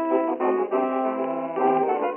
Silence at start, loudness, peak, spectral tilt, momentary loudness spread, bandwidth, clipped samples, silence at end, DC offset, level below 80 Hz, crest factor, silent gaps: 0 s; -24 LUFS; -10 dBFS; -5 dB/octave; 4 LU; 3.5 kHz; under 0.1%; 0 s; under 0.1%; -82 dBFS; 14 dB; none